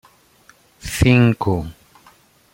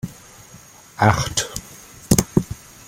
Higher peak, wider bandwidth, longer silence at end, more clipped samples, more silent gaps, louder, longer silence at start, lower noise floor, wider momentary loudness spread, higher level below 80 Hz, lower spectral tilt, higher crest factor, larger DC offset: about the same, -2 dBFS vs 0 dBFS; about the same, 16.5 kHz vs 17 kHz; first, 0.8 s vs 0.3 s; neither; neither; first, -17 LUFS vs -20 LUFS; first, 0.85 s vs 0.05 s; first, -53 dBFS vs -45 dBFS; about the same, 21 LU vs 22 LU; about the same, -36 dBFS vs -40 dBFS; first, -6.5 dB/octave vs -4.5 dB/octave; about the same, 18 dB vs 22 dB; neither